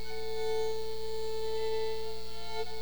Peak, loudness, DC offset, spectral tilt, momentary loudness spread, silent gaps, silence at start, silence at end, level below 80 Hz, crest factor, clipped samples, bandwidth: -22 dBFS; -36 LUFS; 3%; -3.5 dB/octave; 7 LU; none; 0 s; 0 s; -52 dBFS; 12 dB; under 0.1%; over 20 kHz